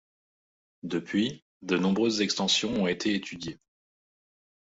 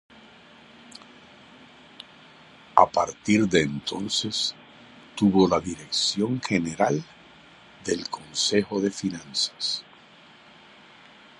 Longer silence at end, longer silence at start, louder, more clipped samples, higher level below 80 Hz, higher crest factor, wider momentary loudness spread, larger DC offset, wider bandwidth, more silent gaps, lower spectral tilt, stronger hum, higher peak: second, 1.15 s vs 1.6 s; about the same, 0.85 s vs 0.95 s; second, -27 LUFS vs -24 LUFS; neither; second, -64 dBFS vs -58 dBFS; second, 18 dB vs 26 dB; second, 15 LU vs 25 LU; neither; second, 8 kHz vs 11.5 kHz; first, 1.42-1.60 s vs none; about the same, -4 dB/octave vs -4 dB/octave; neither; second, -12 dBFS vs 0 dBFS